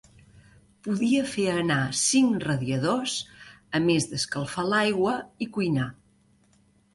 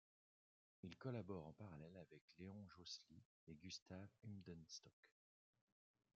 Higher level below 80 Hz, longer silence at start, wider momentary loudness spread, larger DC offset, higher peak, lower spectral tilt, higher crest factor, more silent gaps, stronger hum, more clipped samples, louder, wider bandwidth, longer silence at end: first, -60 dBFS vs -86 dBFS; about the same, 0.85 s vs 0.85 s; about the same, 9 LU vs 10 LU; neither; first, -10 dBFS vs -38 dBFS; second, -4 dB/octave vs -5.5 dB/octave; second, 16 dB vs 22 dB; second, none vs 2.21-2.28 s, 3.25-3.47 s, 3.82-3.86 s, 4.93-5.03 s; neither; neither; first, -25 LUFS vs -58 LUFS; first, 11.5 kHz vs 7.4 kHz; about the same, 1 s vs 1.05 s